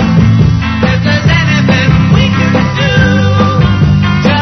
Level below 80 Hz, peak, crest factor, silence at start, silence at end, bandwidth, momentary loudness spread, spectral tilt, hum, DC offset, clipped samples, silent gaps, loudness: -24 dBFS; 0 dBFS; 8 dB; 0 s; 0 s; 6.4 kHz; 2 LU; -6.5 dB/octave; none; 0.3%; under 0.1%; none; -9 LUFS